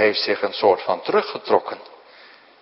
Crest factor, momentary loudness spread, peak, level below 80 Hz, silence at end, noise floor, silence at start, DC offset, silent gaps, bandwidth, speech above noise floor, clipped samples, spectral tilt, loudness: 20 dB; 7 LU; -2 dBFS; -68 dBFS; 0.75 s; -48 dBFS; 0 s; under 0.1%; none; 5.8 kHz; 28 dB; under 0.1%; -7.5 dB/octave; -20 LUFS